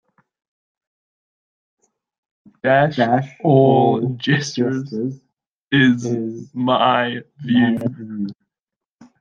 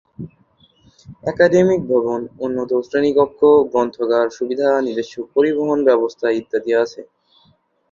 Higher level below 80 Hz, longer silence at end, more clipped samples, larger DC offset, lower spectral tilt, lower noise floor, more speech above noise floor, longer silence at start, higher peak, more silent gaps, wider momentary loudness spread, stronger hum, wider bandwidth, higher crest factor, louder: second, -62 dBFS vs -56 dBFS; about the same, 0.9 s vs 0.9 s; neither; neither; about the same, -6.5 dB/octave vs -6.5 dB/octave; first, -87 dBFS vs -58 dBFS; first, 70 dB vs 41 dB; first, 2.65 s vs 0.2 s; about the same, -2 dBFS vs -2 dBFS; first, 5.47-5.67 s vs none; about the same, 14 LU vs 12 LU; neither; about the same, 7.6 kHz vs 7.4 kHz; about the same, 18 dB vs 16 dB; about the same, -18 LUFS vs -17 LUFS